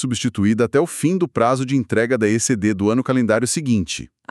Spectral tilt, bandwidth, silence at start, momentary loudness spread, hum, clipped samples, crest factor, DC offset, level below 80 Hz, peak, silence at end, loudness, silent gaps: -5 dB/octave; 13.5 kHz; 0 s; 3 LU; none; under 0.1%; 16 dB; under 0.1%; -52 dBFS; -4 dBFS; 0.25 s; -19 LUFS; none